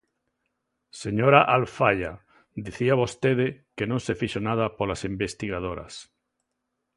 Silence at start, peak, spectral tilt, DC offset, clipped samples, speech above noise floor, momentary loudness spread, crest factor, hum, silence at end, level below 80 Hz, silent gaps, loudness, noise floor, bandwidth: 0.95 s; -2 dBFS; -6 dB/octave; under 0.1%; under 0.1%; 55 dB; 19 LU; 24 dB; none; 0.95 s; -52 dBFS; none; -24 LUFS; -80 dBFS; 11.5 kHz